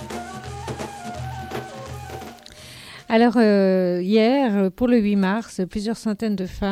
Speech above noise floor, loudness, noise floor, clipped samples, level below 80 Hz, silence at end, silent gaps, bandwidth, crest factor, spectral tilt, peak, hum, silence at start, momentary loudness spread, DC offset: 23 dB; -21 LUFS; -42 dBFS; under 0.1%; -46 dBFS; 0 s; none; 15 kHz; 16 dB; -6.5 dB/octave; -6 dBFS; none; 0 s; 20 LU; under 0.1%